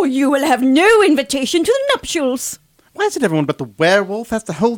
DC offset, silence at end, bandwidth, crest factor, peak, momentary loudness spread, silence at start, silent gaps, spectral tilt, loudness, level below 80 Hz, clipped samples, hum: under 0.1%; 0 s; 19 kHz; 14 dB; -2 dBFS; 11 LU; 0 s; none; -4 dB/octave; -15 LUFS; -50 dBFS; under 0.1%; none